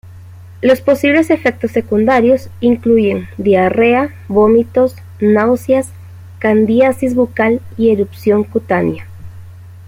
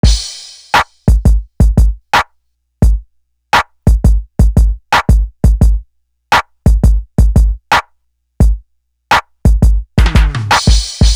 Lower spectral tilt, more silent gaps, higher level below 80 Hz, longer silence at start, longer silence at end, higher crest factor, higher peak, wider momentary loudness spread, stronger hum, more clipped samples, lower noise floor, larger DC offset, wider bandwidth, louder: first, -7 dB/octave vs -5 dB/octave; neither; second, -48 dBFS vs -12 dBFS; about the same, 0.05 s vs 0.05 s; about the same, 0 s vs 0 s; about the same, 12 dB vs 10 dB; about the same, 0 dBFS vs 0 dBFS; first, 6 LU vs 3 LU; neither; neither; second, -34 dBFS vs -60 dBFS; neither; first, 16 kHz vs 13 kHz; about the same, -13 LUFS vs -13 LUFS